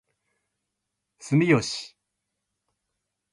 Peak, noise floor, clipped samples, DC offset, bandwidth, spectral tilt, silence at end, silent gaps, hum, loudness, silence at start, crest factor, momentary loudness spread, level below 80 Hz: -8 dBFS; -82 dBFS; under 0.1%; under 0.1%; 11.5 kHz; -5.5 dB/octave; 1.45 s; none; none; -23 LUFS; 1.2 s; 22 dB; 24 LU; -66 dBFS